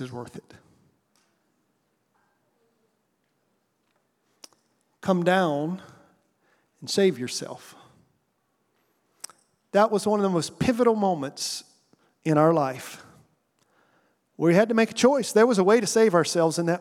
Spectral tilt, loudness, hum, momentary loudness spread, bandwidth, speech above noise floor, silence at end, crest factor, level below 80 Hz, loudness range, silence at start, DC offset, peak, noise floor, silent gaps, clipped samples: -5 dB/octave; -23 LUFS; none; 20 LU; 16 kHz; 50 dB; 0 s; 20 dB; -66 dBFS; 9 LU; 0 s; under 0.1%; -6 dBFS; -73 dBFS; none; under 0.1%